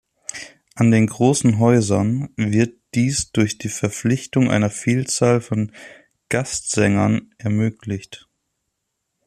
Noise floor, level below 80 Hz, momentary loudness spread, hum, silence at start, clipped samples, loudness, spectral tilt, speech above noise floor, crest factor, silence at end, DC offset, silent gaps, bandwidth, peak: -76 dBFS; -52 dBFS; 13 LU; none; 0.35 s; under 0.1%; -19 LUFS; -5.5 dB/octave; 58 dB; 16 dB; 1.1 s; under 0.1%; none; 13.5 kHz; -4 dBFS